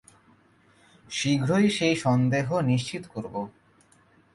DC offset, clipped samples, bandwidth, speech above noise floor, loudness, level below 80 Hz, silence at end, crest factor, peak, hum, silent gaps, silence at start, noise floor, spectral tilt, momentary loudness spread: under 0.1%; under 0.1%; 11.5 kHz; 36 dB; -25 LUFS; -62 dBFS; 0.85 s; 16 dB; -12 dBFS; none; none; 1.1 s; -60 dBFS; -5.5 dB/octave; 13 LU